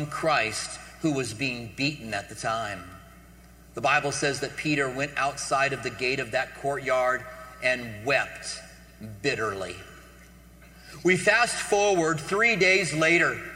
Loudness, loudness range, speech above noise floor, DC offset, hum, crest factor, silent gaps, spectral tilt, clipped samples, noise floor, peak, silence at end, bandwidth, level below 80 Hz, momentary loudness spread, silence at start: -25 LUFS; 7 LU; 25 dB; under 0.1%; 60 Hz at -55 dBFS; 20 dB; none; -3.5 dB/octave; under 0.1%; -51 dBFS; -6 dBFS; 0 s; 16 kHz; -54 dBFS; 15 LU; 0 s